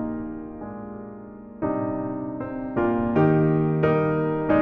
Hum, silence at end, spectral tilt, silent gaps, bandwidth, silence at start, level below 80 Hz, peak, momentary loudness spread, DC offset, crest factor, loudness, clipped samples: none; 0 s; -8.5 dB/octave; none; 4.3 kHz; 0 s; -48 dBFS; -8 dBFS; 17 LU; under 0.1%; 16 dB; -24 LUFS; under 0.1%